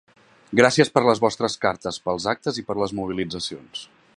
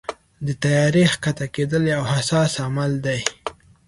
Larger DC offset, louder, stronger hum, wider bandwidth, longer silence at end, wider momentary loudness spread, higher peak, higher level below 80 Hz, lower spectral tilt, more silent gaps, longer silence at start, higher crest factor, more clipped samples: neither; about the same, -22 LUFS vs -21 LUFS; neither; about the same, 11.5 kHz vs 11.5 kHz; about the same, 0.3 s vs 0.35 s; about the same, 13 LU vs 13 LU; about the same, 0 dBFS vs 0 dBFS; second, -56 dBFS vs -50 dBFS; about the same, -4.5 dB/octave vs -5 dB/octave; neither; first, 0.5 s vs 0.1 s; about the same, 22 dB vs 20 dB; neither